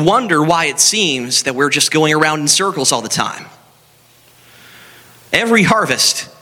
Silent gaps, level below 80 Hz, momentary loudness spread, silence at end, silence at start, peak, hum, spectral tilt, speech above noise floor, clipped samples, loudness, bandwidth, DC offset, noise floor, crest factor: none; -54 dBFS; 6 LU; 0.15 s; 0 s; 0 dBFS; none; -2.5 dB/octave; 35 dB; under 0.1%; -13 LUFS; over 20 kHz; under 0.1%; -49 dBFS; 16 dB